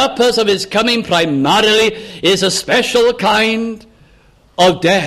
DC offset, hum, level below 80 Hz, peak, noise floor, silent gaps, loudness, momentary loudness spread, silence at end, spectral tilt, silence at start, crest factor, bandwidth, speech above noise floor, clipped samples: under 0.1%; none; -46 dBFS; -2 dBFS; -48 dBFS; none; -13 LUFS; 6 LU; 0 s; -3.5 dB/octave; 0 s; 12 dB; 15.5 kHz; 35 dB; under 0.1%